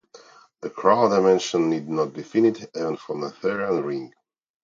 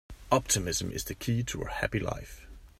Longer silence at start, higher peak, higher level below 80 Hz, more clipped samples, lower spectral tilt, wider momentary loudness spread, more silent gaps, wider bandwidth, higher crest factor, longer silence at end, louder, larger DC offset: about the same, 0.15 s vs 0.1 s; first, -4 dBFS vs -10 dBFS; second, -68 dBFS vs -46 dBFS; neither; first, -5.5 dB/octave vs -4 dB/octave; about the same, 14 LU vs 13 LU; neither; second, 7.6 kHz vs 16 kHz; about the same, 20 dB vs 24 dB; first, 0.55 s vs 0.1 s; first, -23 LUFS vs -31 LUFS; neither